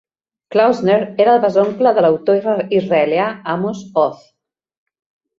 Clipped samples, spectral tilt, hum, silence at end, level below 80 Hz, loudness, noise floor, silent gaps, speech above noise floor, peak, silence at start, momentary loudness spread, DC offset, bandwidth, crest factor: under 0.1%; -7 dB/octave; none; 1.25 s; -62 dBFS; -15 LUFS; -41 dBFS; none; 27 dB; -2 dBFS; 0.5 s; 7 LU; under 0.1%; 7.4 kHz; 14 dB